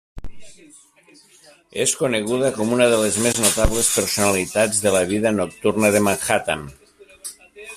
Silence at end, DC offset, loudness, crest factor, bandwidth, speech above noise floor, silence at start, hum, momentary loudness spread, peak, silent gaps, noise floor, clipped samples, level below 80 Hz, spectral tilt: 0 s; under 0.1%; -19 LUFS; 18 dB; 16 kHz; 20 dB; 0.15 s; none; 17 LU; -2 dBFS; none; -40 dBFS; under 0.1%; -38 dBFS; -3 dB/octave